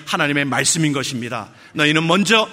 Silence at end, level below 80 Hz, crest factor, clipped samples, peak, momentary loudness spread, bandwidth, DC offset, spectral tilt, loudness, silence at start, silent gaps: 0 s; -60 dBFS; 18 dB; under 0.1%; 0 dBFS; 13 LU; 16 kHz; under 0.1%; -3.5 dB/octave; -17 LUFS; 0 s; none